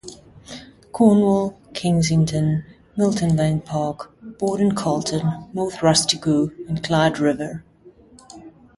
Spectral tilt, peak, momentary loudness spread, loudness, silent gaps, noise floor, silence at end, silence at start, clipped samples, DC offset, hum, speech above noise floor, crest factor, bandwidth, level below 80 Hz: -5.5 dB/octave; -2 dBFS; 20 LU; -20 LUFS; none; -49 dBFS; 0.3 s; 0.05 s; under 0.1%; under 0.1%; none; 29 dB; 18 dB; 11.5 kHz; -50 dBFS